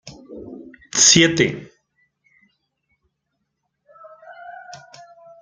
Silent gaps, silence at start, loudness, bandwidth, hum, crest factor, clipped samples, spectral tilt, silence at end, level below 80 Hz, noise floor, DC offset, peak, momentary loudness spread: none; 0.05 s; -14 LUFS; 10.5 kHz; none; 24 dB; under 0.1%; -2 dB/octave; 0.65 s; -58 dBFS; -76 dBFS; under 0.1%; 0 dBFS; 29 LU